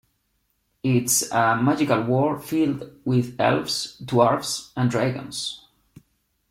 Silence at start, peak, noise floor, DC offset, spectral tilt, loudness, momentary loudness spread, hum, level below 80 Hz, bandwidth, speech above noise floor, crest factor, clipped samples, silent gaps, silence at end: 0.85 s; -2 dBFS; -71 dBFS; under 0.1%; -4.5 dB/octave; -22 LUFS; 10 LU; none; -60 dBFS; 16.5 kHz; 49 dB; 20 dB; under 0.1%; none; 0.95 s